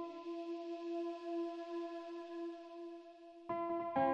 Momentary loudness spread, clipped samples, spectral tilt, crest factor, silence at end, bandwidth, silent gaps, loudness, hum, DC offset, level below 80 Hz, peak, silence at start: 12 LU; under 0.1%; -6.5 dB/octave; 20 dB; 0 s; 7.4 kHz; none; -44 LUFS; none; under 0.1%; -82 dBFS; -22 dBFS; 0 s